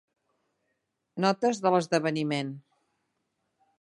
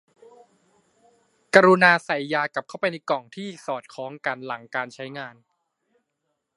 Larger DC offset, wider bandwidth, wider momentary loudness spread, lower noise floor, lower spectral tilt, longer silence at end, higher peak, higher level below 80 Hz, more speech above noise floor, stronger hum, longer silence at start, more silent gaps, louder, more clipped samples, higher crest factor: neither; about the same, 11.5 kHz vs 11.5 kHz; second, 15 LU vs 19 LU; about the same, -79 dBFS vs -78 dBFS; about the same, -5.5 dB/octave vs -5 dB/octave; about the same, 1.2 s vs 1.25 s; second, -10 dBFS vs 0 dBFS; about the same, -76 dBFS vs -76 dBFS; about the same, 53 dB vs 55 dB; neither; second, 1.15 s vs 1.55 s; neither; second, -27 LUFS vs -22 LUFS; neither; about the same, 20 dB vs 24 dB